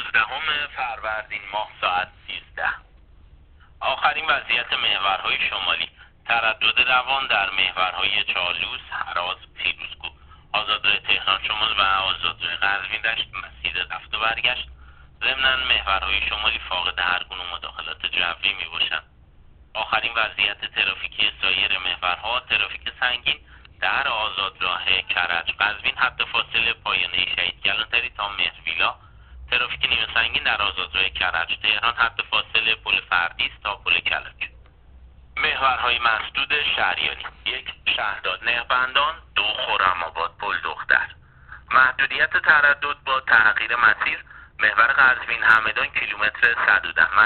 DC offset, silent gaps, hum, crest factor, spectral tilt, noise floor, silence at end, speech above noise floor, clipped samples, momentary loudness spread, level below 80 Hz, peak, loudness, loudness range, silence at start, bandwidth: under 0.1%; none; none; 20 dB; 2.5 dB/octave; -50 dBFS; 0 s; 27 dB; under 0.1%; 10 LU; -48 dBFS; -4 dBFS; -21 LUFS; 5 LU; 0 s; 4.7 kHz